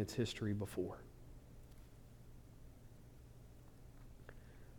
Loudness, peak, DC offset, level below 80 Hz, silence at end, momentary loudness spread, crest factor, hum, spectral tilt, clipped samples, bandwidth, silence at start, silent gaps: -43 LUFS; -26 dBFS; under 0.1%; -60 dBFS; 0 s; 21 LU; 22 dB; none; -6 dB/octave; under 0.1%; over 20 kHz; 0 s; none